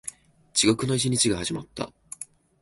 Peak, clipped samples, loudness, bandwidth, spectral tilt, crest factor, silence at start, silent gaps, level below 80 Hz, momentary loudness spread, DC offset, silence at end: -6 dBFS; under 0.1%; -24 LUFS; 12 kHz; -3.5 dB/octave; 20 dB; 0.05 s; none; -54 dBFS; 18 LU; under 0.1%; 0.4 s